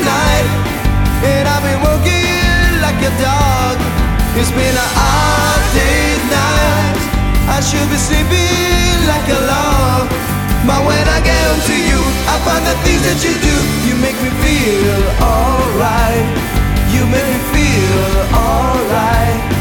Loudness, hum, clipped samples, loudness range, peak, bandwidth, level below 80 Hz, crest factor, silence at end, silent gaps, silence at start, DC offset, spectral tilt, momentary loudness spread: -13 LUFS; none; under 0.1%; 1 LU; 0 dBFS; 19 kHz; -18 dBFS; 12 dB; 0 s; none; 0 s; under 0.1%; -4.5 dB/octave; 3 LU